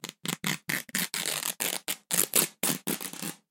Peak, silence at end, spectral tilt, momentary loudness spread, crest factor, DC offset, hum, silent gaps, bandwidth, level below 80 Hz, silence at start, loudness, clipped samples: 0 dBFS; 0.15 s; -1.5 dB/octave; 9 LU; 32 dB; under 0.1%; none; none; 17 kHz; -76 dBFS; 0.05 s; -29 LUFS; under 0.1%